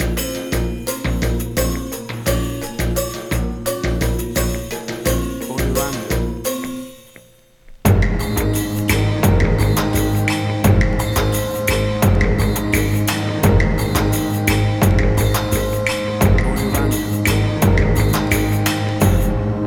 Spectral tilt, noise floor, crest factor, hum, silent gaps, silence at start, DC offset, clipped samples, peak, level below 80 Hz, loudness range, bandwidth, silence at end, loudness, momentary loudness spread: -5.5 dB/octave; -48 dBFS; 16 dB; none; none; 0 s; under 0.1%; under 0.1%; 0 dBFS; -24 dBFS; 5 LU; 19.5 kHz; 0 s; -18 LUFS; 7 LU